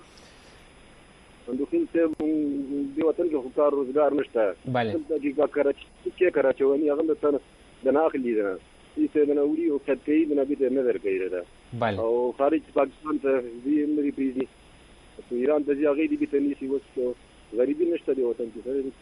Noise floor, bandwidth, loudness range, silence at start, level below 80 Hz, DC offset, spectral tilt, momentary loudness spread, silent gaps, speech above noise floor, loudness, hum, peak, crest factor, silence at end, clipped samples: -52 dBFS; 10.5 kHz; 2 LU; 1.45 s; -58 dBFS; under 0.1%; -8 dB/octave; 8 LU; none; 27 dB; -26 LUFS; none; -10 dBFS; 16 dB; 0.1 s; under 0.1%